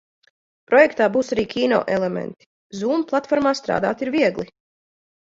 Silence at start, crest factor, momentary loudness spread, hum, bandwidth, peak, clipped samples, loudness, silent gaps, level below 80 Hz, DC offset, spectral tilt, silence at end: 0.7 s; 18 dB; 14 LU; none; 7.8 kHz; -2 dBFS; under 0.1%; -20 LUFS; 2.46-2.70 s; -58 dBFS; under 0.1%; -5.5 dB/octave; 0.95 s